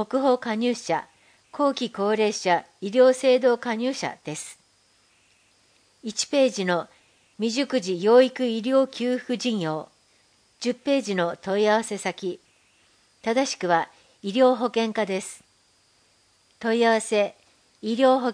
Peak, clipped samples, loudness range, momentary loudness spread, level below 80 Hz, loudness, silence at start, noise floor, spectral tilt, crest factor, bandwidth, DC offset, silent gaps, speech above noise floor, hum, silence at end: -6 dBFS; under 0.1%; 5 LU; 14 LU; -76 dBFS; -24 LUFS; 0 s; -63 dBFS; -4 dB/octave; 18 dB; 10.5 kHz; under 0.1%; none; 40 dB; none; 0 s